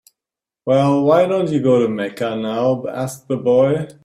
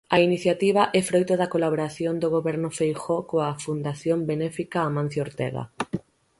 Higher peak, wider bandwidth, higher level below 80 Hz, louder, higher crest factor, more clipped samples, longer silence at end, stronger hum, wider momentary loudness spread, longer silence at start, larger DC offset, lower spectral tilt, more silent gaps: first, -2 dBFS vs -6 dBFS; first, 15 kHz vs 11.5 kHz; about the same, -58 dBFS vs -62 dBFS; first, -17 LUFS vs -25 LUFS; about the same, 14 dB vs 18 dB; neither; second, 0.15 s vs 0.4 s; neither; about the same, 9 LU vs 9 LU; first, 0.65 s vs 0.1 s; neither; about the same, -7 dB/octave vs -6 dB/octave; neither